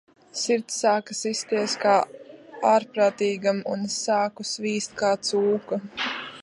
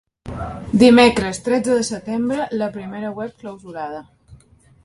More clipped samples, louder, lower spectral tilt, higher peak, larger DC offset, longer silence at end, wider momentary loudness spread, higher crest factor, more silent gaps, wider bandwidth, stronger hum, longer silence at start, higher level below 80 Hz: neither; second, -24 LUFS vs -17 LUFS; second, -3 dB/octave vs -5 dB/octave; second, -6 dBFS vs 0 dBFS; neither; second, 0 s vs 0.5 s; second, 8 LU vs 19 LU; about the same, 18 dB vs 18 dB; neither; about the same, 11.5 kHz vs 11.5 kHz; neither; about the same, 0.35 s vs 0.25 s; second, -72 dBFS vs -44 dBFS